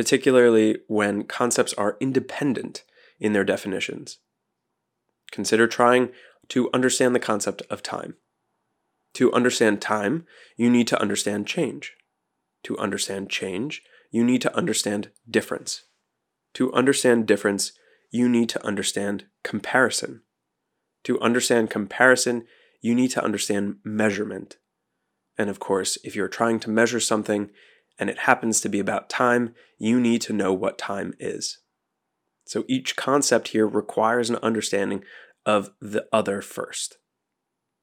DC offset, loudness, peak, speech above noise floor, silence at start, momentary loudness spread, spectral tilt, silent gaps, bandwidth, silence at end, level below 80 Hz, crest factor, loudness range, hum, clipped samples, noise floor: under 0.1%; -23 LUFS; 0 dBFS; 58 dB; 0 s; 12 LU; -3.5 dB/octave; none; 16.5 kHz; 0.95 s; -78 dBFS; 24 dB; 4 LU; none; under 0.1%; -81 dBFS